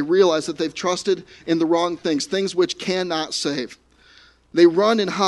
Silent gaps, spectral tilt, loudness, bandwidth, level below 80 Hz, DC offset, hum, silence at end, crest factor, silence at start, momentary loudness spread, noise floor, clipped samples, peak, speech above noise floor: none; -4.5 dB/octave; -20 LUFS; 11.5 kHz; -62 dBFS; under 0.1%; none; 0 s; 18 dB; 0 s; 10 LU; -52 dBFS; under 0.1%; -2 dBFS; 32 dB